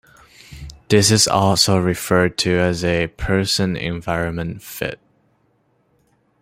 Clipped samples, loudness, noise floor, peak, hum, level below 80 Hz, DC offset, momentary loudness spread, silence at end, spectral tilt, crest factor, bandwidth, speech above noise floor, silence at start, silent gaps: under 0.1%; -18 LUFS; -62 dBFS; -2 dBFS; none; -40 dBFS; under 0.1%; 14 LU; 1.45 s; -4 dB/octave; 18 dB; 16 kHz; 44 dB; 0.5 s; none